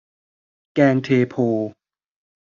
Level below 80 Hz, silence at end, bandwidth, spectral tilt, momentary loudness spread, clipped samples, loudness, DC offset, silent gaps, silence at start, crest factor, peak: -64 dBFS; 0.7 s; 7.2 kHz; -7 dB/octave; 10 LU; under 0.1%; -19 LUFS; under 0.1%; none; 0.75 s; 18 dB; -2 dBFS